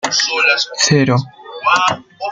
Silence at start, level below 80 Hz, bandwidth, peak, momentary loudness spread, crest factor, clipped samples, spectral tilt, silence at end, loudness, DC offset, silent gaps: 0.05 s; -56 dBFS; 10 kHz; 0 dBFS; 8 LU; 16 dB; under 0.1%; -3.5 dB/octave; 0 s; -14 LUFS; under 0.1%; none